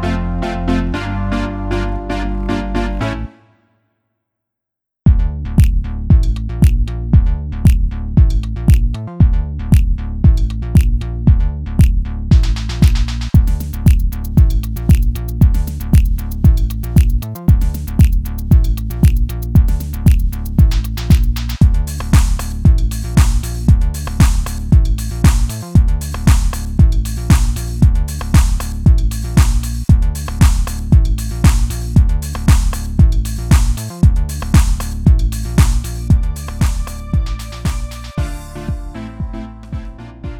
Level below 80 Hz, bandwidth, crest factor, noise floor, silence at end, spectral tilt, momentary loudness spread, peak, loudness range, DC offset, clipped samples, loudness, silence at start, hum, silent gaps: -16 dBFS; 17.5 kHz; 12 dB; -81 dBFS; 0 s; -6.5 dB/octave; 7 LU; 0 dBFS; 5 LU; under 0.1%; under 0.1%; -16 LUFS; 0 s; none; none